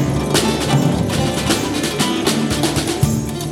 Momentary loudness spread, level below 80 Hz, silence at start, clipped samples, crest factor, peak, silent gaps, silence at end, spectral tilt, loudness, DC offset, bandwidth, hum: 2 LU; -34 dBFS; 0 s; under 0.1%; 16 dB; -2 dBFS; none; 0 s; -4.5 dB/octave; -17 LUFS; under 0.1%; 16.5 kHz; none